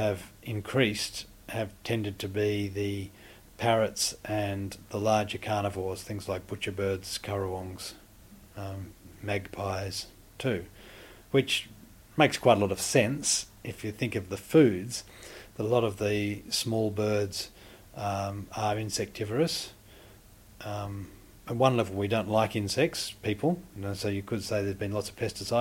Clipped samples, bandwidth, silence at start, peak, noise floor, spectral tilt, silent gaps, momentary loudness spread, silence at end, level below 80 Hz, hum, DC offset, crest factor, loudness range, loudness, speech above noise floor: under 0.1%; 17 kHz; 0 s; -6 dBFS; -54 dBFS; -4.5 dB/octave; none; 15 LU; 0 s; -56 dBFS; none; under 0.1%; 24 dB; 8 LU; -30 LUFS; 24 dB